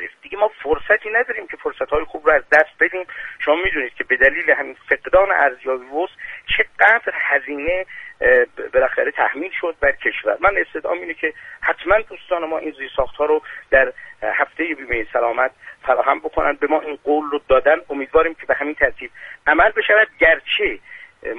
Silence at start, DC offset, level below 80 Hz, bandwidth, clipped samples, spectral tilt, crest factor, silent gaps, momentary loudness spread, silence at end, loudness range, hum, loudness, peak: 0 s; under 0.1%; -42 dBFS; 6.8 kHz; under 0.1%; -5.5 dB/octave; 18 dB; none; 11 LU; 0 s; 3 LU; none; -18 LUFS; 0 dBFS